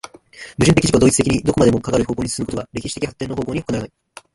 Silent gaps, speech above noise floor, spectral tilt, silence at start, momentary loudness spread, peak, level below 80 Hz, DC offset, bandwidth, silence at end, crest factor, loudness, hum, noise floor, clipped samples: none; 23 dB; -5 dB/octave; 0.35 s; 14 LU; 0 dBFS; -38 dBFS; under 0.1%; 11.5 kHz; 0.5 s; 18 dB; -18 LUFS; none; -40 dBFS; under 0.1%